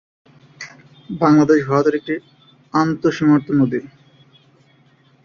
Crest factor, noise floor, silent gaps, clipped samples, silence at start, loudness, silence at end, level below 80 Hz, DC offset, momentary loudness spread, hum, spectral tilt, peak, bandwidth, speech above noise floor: 16 dB; -54 dBFS; none; under 0.1%; 0.6 s; -17 LUFS; 1.4 s; -58 dBFS; under 0.1%; 22 LU; none; -7.5 dB/octave; -2 dBFS; 7 kHz; 38 dB